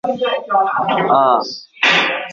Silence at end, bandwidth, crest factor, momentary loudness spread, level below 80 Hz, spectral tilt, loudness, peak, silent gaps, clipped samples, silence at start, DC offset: 0 s; 7.6 kHz; 14 dB; 6 LU; -64 dBFS; -3.5 dB/octave; -15 LUFS; -2 dBFS; none; under 0.1%; 0.05 s; under 0.1%